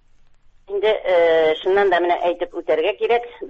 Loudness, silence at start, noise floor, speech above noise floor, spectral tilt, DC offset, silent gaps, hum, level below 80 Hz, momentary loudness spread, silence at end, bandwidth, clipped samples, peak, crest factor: -19 LUFS; 0.7 s; -50 dBFS; 32 dB; -5 dB/octave; under 0.1%; none; none; -56 dBFS; 6 LU; 0 s; 7.2 kHz; under 0.1%; -6 dBFS; 14 dB